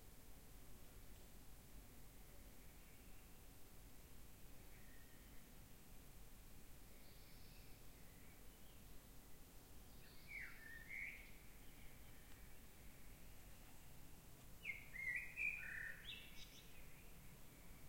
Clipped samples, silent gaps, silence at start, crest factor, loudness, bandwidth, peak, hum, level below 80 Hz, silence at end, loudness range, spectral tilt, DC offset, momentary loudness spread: under 0.1%; none; 0 s; 22 dB; -56 LUFS; 16.5 kHz; -34 dBFS; none; -64 dBFS; 0 s; 14 LU; -3 dB/octave; under 0.1%; 14 LU